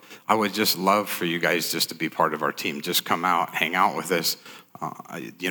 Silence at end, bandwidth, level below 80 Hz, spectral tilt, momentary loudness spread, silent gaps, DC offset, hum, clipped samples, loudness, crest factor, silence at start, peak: 0 s; over 20 kHz; -78 dBFS; -3 dB/octave; 14 LU; none; under 0.1%; none; under 0.1%; -24 LUFS; 22 dB; 0.1 s; -4 dBFS